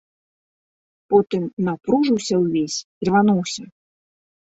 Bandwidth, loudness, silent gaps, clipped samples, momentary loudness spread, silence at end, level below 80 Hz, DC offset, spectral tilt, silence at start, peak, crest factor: 8 kHz; -20 LUFS; 1.53-1.57 s, 2.84-3.01 s; under 0.1%; 8 LU; 0.95 s; -60 dBFS; under 0.1%; -5.5 dB/octave; 1.1 s; -2 dBFS; 20 dB